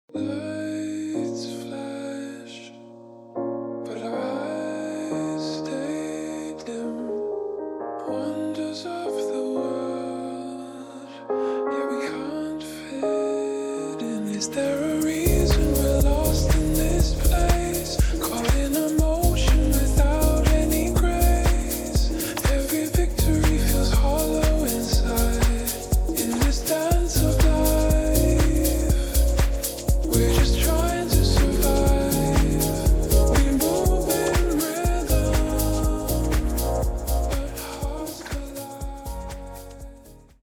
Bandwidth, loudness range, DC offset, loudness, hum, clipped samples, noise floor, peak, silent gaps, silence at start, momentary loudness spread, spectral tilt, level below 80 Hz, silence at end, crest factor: over 20 kHz; 9 LU; under 0.1%; -24 LUFS; none; under 0.1%; -47 dBFS; -4 dBFS; none; 0.15 s; 12 LU; -5.5 dB/octave; -24 dBFS; 0.25 s; 18 dB